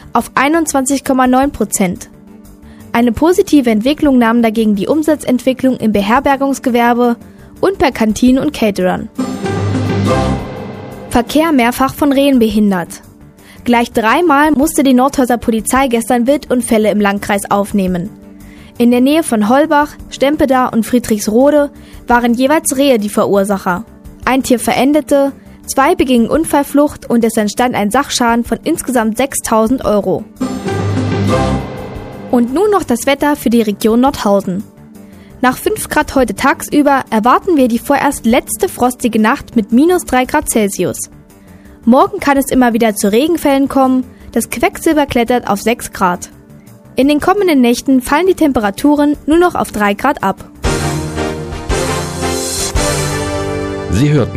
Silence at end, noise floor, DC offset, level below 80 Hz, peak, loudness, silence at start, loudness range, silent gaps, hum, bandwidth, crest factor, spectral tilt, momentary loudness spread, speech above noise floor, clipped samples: 0 s; -38 dBFS; under 0.1%; -34 dBFS; 0 dBFS; -12 LUFS; 0.05 s; 3 LU; none; none; 16 kHz; 12 dB; -5 dB/octave; 8 LU; 27 dB; under 0.1%